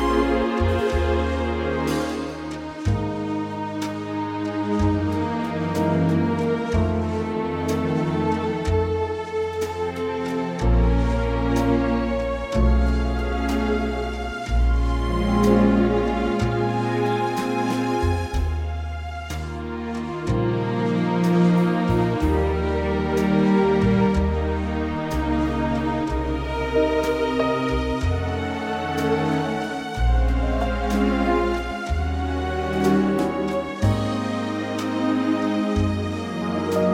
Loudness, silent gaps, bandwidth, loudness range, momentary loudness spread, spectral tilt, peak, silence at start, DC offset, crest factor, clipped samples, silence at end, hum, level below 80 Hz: -23 LUFS; none; 16 kHz; 4 LU; 7 LU; -7 dB/octave; -6 dBFS; 0 s; under 0.1%; 16 dB; under 0.1%; 0 s; none; -28 dBFS